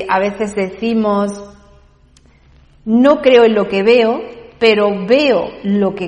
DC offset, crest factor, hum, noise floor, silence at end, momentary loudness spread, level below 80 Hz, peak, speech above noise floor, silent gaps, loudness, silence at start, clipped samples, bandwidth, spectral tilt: under 0.1%; 14 dB; none; -48 dBFS; 0 s; 11 LU; -48 dBFS; 0 dBFS; 35 dB; none; -13 LUFS; 0 s; under 0.1%; 10.5 kHz; -6 dB/octave